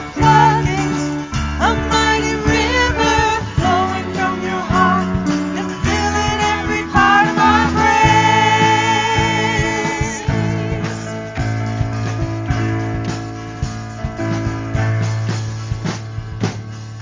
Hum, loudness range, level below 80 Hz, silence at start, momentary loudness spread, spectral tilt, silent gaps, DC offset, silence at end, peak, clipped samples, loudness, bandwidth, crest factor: none; 9 LU; -30 dBFS; 0 s; 12 LU; -5 dB/octave; none; under 0.1%; 0 s; 0 dBFS; under 0.1%; -16 LUFS; 7.6 kHz; 16 dB